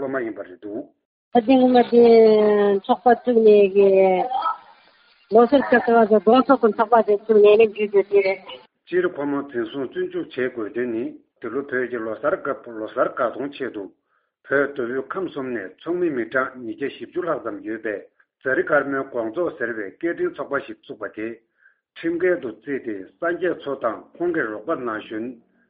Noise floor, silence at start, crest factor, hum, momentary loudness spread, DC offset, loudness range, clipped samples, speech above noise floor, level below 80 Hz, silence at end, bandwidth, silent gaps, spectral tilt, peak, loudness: -56 dBFS; 0 s; 18 dB; none; 16 LU; under 0.1%; 11 LU; under 0.1%; 36 dB; -64 dBFS; 0.35 s; 5 kHz; 1.05-1.31 s; -4 dB/octave; -2 dBFS; -20 LUFS